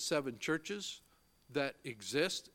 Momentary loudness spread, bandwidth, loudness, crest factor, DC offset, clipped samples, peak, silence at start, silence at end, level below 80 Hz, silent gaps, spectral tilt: 10 LU; 17 kHz; -38 LUFS; 22 dB; under 0.1%; under 0.1%; -18 dBFS; 0 s; 0.05 s; -76 dBFS; none; -3 dB/octave